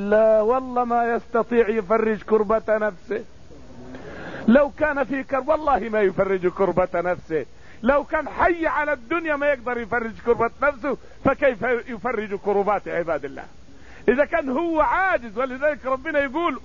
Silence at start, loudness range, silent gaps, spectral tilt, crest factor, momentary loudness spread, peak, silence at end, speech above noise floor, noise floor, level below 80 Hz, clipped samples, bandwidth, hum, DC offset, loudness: 0 s; 2 LU; none; -7 dB/octave; 16 dB; 9 LU; -6 dBFS; 0.05 s; 24 dB; -46 dBFS; -46 dBFS; under 0.1%; 7.4 kHz; none; 0.8%; -22 LUFS